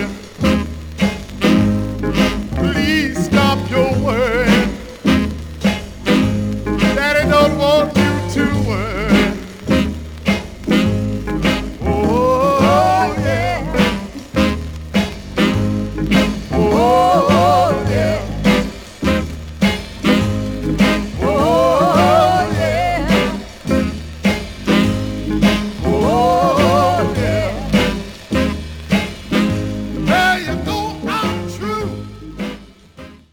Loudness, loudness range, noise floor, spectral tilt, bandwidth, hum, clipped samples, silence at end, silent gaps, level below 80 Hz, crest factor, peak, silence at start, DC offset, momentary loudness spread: -16 LUFS; 3 LU; -39 dBFS; -6 dB/octave; 19 kHz; none; under 0.1%; 0.15 s; none; -30 dBFS; 16 dB; 0 dBFS; 0 s; under 0.1%; 9 LU